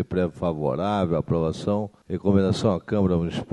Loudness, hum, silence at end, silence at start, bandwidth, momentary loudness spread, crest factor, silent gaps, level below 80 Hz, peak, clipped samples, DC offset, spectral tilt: -24 LUFS; none; 0 s; 0 s; 10.5 kHz; 5 LU; 18 dB; none; -46 dBFS; -6 dBFS; under 0.1%; under 0.1%; -7.5 dB/octave